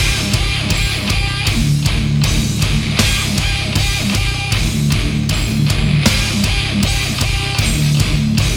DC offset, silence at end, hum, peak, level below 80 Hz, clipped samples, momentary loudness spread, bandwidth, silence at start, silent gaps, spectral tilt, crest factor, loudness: under 0.1%; 0 s; none; 0 dBFS; -22 dBFS; under 0.1%; 3 LU; over 20 kHz; 0 s; none; -4 dB/octave; 14 dB; -15 LUFS